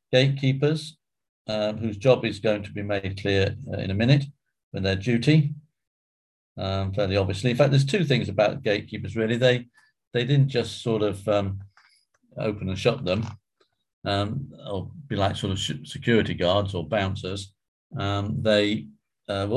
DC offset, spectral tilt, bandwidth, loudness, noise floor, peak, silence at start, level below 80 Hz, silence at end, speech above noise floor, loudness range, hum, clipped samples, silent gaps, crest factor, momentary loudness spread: under 0.1%; -6.5 dB/octave; 11.5 kHz; -25 LUFS; -70 dBFS; -6 dBFS; 0.1 s; -46 dBFS; 0 s; 46 dB; 5 LU; none; under 0.1%; 1.29-1.45 s, 4.63-4.71 s, 5.87-6.56 s, 10.07-10.11 s, 13.93-14.02 s, 17.68-17.90 s; 20 dB; 12 LU